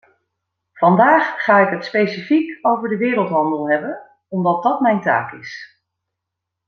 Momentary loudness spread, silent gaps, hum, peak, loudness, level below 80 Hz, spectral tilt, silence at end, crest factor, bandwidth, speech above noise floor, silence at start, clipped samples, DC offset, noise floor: 16 LU; none; none; -2 dBFS; -17 LUFS; -68 dBFS; -8 dB/octave; 1 s; 16 dB; 6.6 kHz; 64 dB; 0.75 s; under 0.1%; under 0.1%; -81 dBFS